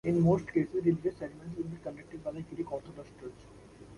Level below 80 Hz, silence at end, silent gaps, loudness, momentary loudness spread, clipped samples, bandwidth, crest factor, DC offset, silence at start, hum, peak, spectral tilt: -58 dBFS; 0 s; none; -33 LUFS; 21 LU; under 0.1%; 11 kHz; 18 dB; under 0.1%; 0.05 s; none; -16 dBFS; -9.5 dB/octave